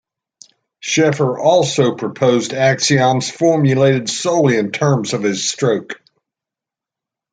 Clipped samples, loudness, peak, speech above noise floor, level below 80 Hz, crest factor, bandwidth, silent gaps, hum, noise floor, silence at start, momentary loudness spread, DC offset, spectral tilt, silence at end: under 0.1%; -15 LUFS; -2 dBFS; 72 dB; -60 dBFS; 14 dB; 9.4 kHz; none; none; -86 dBFS; 0.85 s; 5 LU; under 0.1%; -5 dB/octave; 1.35 s